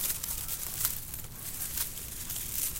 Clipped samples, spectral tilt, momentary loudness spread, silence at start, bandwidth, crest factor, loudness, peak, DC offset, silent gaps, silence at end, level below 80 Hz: under 0.1%; -1 dB/octave; 8 LU; 0 s; 17 kHz; 26 dB; -33 LUFS; -10 dBFS; under 0.1%; none; 0 s; -48 dBFS